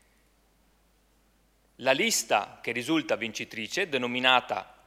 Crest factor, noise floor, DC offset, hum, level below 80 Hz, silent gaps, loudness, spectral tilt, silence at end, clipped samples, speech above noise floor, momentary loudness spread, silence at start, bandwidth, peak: 24 dB; -66 dBFS; under 0.1%; none; -68 dBFS; none; -27 LUFS; -2 dB/octave; 0.2 s; under 0.1%; 38 dB; 10 LU; 1.8 s; 16 kHz; -6 dBFS